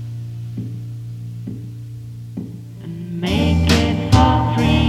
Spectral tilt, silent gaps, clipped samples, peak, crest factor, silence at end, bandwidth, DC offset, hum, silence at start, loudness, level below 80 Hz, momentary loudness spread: -6 dB/octave; none; under 0.1%; 0 dBFS; 18 dB; 0 s; 14 kHz; under 0.1%; none; 0 s; -18 LUFS; -28 dBFS; 18 LU